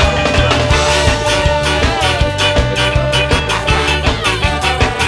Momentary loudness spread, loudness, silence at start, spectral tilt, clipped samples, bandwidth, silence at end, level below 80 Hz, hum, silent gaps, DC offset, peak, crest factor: 2 LU; -13 LUFS; 0 s; -4 dB/octave; under 0.1%; 11 kHz; 0 s; -20 dBFS; none; none; under 0.1%; 0 dBFS; 12 dB